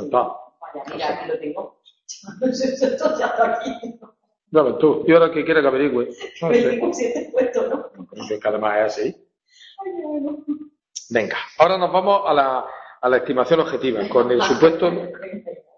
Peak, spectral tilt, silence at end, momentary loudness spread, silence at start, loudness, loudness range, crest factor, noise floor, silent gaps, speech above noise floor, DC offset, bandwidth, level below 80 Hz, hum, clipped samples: 0 dBFS; -5 dB/octave; 0.2 s; 18 LU; 0 s; -20 LUFS; 6 LU; 20 dB; -50 dBFS; none; 31 dB; under 0.1%; 7.4 kHz; -60 dBFS; none; under 0.1%